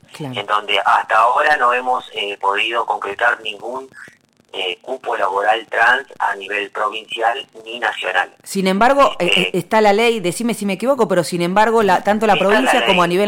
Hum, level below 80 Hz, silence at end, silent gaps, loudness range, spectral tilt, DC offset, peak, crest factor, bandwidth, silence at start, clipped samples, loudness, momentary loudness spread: none; -52 dBFS; 0 s; none; 5 LU; -4 dB/octave; under 0.1%; -4 dBFS; 14 dB; 17 kHz; 0.15 s; under 0.1%; -16 LUFS; 10 LU